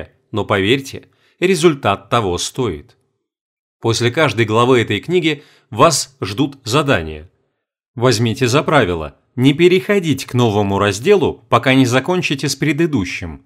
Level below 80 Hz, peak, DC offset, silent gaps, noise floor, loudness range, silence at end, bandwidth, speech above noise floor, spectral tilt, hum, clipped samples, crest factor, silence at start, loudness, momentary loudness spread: -46 dBFS; 0 dBFS; under 0.1%; 3.41-3.80 s, 7.88-7.94 s; -70 dBFS; 3 LU; 0.1 s; 16 kHz; 54 dB; -5 dB/octave; none; under 0.1%; 16 dB; 0 s; -15 LUFS; 11 LU